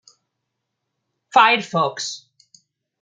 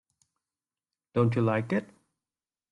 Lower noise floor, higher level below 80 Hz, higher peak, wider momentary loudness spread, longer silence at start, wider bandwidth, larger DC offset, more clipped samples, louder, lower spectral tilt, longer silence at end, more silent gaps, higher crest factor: second, -78 dBFS vs under -90 dBFS; second, -74 dBFS vs -66 dBFS; first, -2 dBFS vs -12 dBFS; first, 15 LU vs 7 LU; first, 1.35 s vs 1.15 s; about the same, 9.4 kHz vs 9.4 kHz; neither; neither; first, -18 LUFS vs -28 LUFS; second, -3 dB/octave vs -9 dB/octave; about the same, 0.85 s vs 0.85 s; neither; about the same, 22 dB vs 20 dB